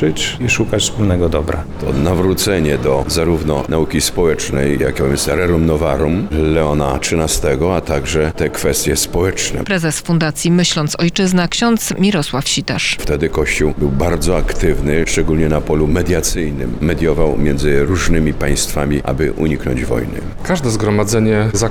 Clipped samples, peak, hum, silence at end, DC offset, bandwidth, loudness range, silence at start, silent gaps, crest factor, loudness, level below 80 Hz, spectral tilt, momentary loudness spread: under 0.1%; 0 dBFS; none; 0 s; under 0.1%; 19 kHz; 1 LU; 0 s; none; 14 dB; -15 LUFS; -24 dBFS; -4.5 dB/octave; 4 LU